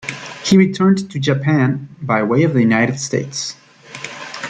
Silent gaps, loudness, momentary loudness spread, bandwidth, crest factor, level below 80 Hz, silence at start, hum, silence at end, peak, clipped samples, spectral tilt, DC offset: none; -16 LUFS; 15 LU; 9.2 kHz; 14 dB; -56 dBFS; 0.05 s; none; 0 s; -2 dBFS; under 0.1%; -5.5 dB/octave; under 0.1%